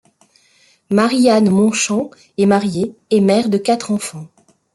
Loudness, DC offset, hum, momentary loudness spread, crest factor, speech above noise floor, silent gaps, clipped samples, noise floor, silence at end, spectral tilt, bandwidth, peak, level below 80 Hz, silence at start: -15 LUFS; under 0.1%; none; 10 LU; 16 dB; 40 dB; none; under 0.1%; -54 dBFS; 0.5 s; -5 dB/octave; 12 kHz; -2 dBFS; -58 dBFS; 0.9 s